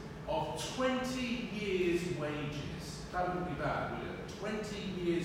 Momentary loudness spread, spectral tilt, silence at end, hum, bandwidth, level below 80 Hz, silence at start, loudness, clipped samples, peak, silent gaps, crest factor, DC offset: 8 LU; -5.5 dB/octave; 0 s; none; 16 kHz; -54 dBFS; 0 s; -37 LUFS; under 0.1%; -20 dBFS; none; 16 dB; under 0.1%